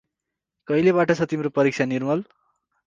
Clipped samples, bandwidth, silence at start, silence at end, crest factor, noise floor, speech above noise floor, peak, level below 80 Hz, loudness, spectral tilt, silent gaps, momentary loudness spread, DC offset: under 0.1%; 7.6 kHz; 0.7 s; 0.65 s; 18 dB; -84 dBFS; 63 dB; -6 dBFS; -64 dBFS; -22 LUFS; -7 dB/octave; none; 7 LU; under 0.1%